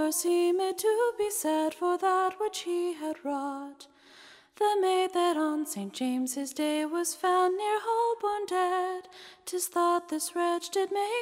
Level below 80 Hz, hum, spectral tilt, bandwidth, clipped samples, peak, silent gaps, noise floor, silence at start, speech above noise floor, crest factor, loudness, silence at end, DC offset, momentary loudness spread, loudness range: -78 dBFS; none; -2.5 dB/octave; 16 kHz; under 0.1%; -14 dBFS; none; -54 dBFS; 0 s; 26 dB; 14 dB; -29 LUFS; 0 s; under 0.1%; 8 LU; 2 LU